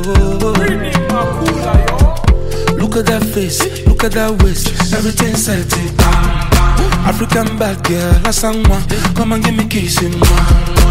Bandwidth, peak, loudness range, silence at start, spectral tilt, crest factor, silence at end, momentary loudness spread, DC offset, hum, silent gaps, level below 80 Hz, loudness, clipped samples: 16.5 kHz; 0 dBFS; 1 LU; 0 s; -5 dB/octave; 12 dB; 0 s; 4 LU; 0.2%; none; none; -14 dBFS; -13 LUFS; under 0.1%